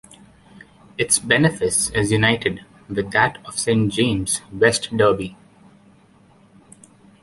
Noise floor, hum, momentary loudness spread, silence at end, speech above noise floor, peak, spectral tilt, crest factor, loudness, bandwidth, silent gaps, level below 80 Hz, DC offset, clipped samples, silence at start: -52 dBFS; none; 10 LU; 1.9 s; 33 dB; -2 dBFS; -3.5 dB/octave; 20 dB; -19 LUFS; 11.5 kHz; none; -48 dBFS; under 0.1%; under 0.1%; 0.55 s